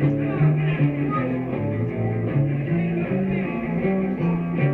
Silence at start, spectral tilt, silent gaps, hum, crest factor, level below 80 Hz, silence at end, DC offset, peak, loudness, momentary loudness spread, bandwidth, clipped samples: 0 s; -11 dB/octave; none; none; 14 dB; -46 dBFS; 0 s; under 0.1%; -8 dBFS; -23 LUFS; 5 LU; 4 kHz; under 0.1%